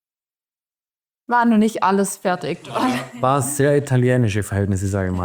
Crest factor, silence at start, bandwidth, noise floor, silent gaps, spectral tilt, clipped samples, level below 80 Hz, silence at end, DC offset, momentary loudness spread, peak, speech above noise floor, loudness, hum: 16 dB; 1.3 s; over 20 kHz; under -90 dBFS; none; -6 dB/octave; under 0.1%; -56 dBFS; 0 s; under 0.1%; 6 LU; -4 dBFS; over 72 dB; -19 LUFS; none